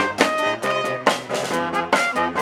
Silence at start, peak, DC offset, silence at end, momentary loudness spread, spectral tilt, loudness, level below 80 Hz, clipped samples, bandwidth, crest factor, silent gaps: 0 s; 0 dBFS; under 0.1%; 0 s; 4 LU; -3 dB/octave; -21 LUFS; -62 dBFS; under 0.1%; 18.5 kHz; 20 dB; none